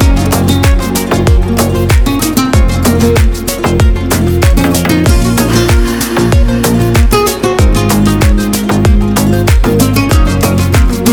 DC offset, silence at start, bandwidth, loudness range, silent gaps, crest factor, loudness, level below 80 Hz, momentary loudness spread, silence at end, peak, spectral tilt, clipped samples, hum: 0.5%; 0 s; over 20 kHz; 1 LU; none; 8 dB; -10 LUFS; -12 dBFS; 2 LU; 0 s; 0 dBFS; -5.5 dB/octave; under 0.1%; none